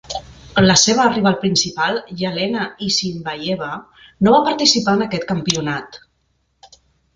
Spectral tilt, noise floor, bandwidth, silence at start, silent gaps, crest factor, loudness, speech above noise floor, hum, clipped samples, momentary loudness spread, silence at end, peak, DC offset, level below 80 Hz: -3.5 dB/octave; -65 dBFS; 9.4 kHz; 0.1 s; none; 18 dB; -17 LUFS; 48 dB; none; under 0.1%; 12 LU; 0.5 s; 0 dBFS; under 0.1%; -48 dBFS